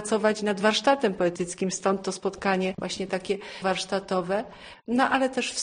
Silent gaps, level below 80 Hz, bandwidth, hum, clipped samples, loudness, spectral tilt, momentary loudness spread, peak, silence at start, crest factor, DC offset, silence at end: none; -60 dBFS; 10 kHz; none; under 0.1%; -26 LUFS; -4 dB/octave; 8 LU; -10 dBFS; 0 s; 16 dB; under 0.1%; 0 s